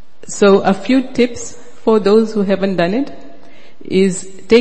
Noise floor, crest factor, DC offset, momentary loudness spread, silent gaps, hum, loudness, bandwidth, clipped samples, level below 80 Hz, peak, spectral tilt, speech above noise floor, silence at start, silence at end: -43 dBFS; 16 dB; 5%; 15 LU; none; none; -14 LUFS; 8.8 kHz; under 0.1%; -52 dBFS; 0 dBFS; -5.5 dB/octave; 30 dB; 0.3 s; 0 s